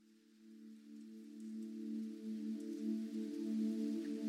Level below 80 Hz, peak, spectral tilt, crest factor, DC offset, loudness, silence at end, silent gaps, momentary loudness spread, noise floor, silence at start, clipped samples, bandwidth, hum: under -90 dBFS; -30 dBFS; -7 dB/octave; 14 dB; under 0.1%; -44 LUFS; 0 s; none; 17 LU; -65 dBFS; 0.1 s; under 0.1%; 13 kHz; none